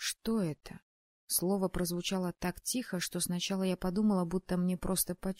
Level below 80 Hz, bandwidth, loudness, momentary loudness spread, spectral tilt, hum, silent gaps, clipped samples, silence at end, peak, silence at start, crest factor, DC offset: -52 dBFS; 16 kHz; -33 LUFS; 6 LU; -4.5 dB/octave; none; 0.82-1.27 s; under 0.1%; 0.05 s; -16 dBFS; 0 s; 18 dB; under 0.1%